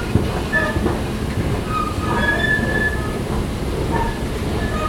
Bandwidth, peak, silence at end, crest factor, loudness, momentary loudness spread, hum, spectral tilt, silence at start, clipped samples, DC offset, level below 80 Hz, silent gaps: 16.5 kHz; -2 dBFS; 0 s; 18 dB; -20 LUFS; 6 LU; none; -6 dB/octave; 0 s; under 0.1%; under 0.1%; -28 dBFS; none